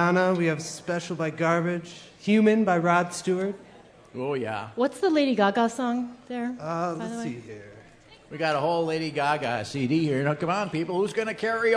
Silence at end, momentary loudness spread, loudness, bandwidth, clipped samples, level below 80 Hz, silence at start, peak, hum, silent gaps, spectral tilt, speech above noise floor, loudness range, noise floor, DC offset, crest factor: 0 s; 12 LU; -26 LUFS; 11 kHz; under 0.1%; -66 dBFS; 0 s; -8 dBFS; none; none; -6 dB/octave; 27 dB; 5 LU; -52 dBFS; under 0.1%; 18 dB